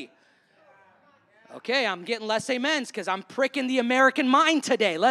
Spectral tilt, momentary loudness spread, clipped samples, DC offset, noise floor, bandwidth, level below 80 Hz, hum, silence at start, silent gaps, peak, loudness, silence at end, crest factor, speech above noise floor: -3 dB/octave; 10 LU; under 0.1%; under 0.1%; -62 dBFS; 12.5 kHz; -84 dBFS; none; 0 s; none; -6 dBFS; -24 LUFS; 0 s; 18 dB; 38 dB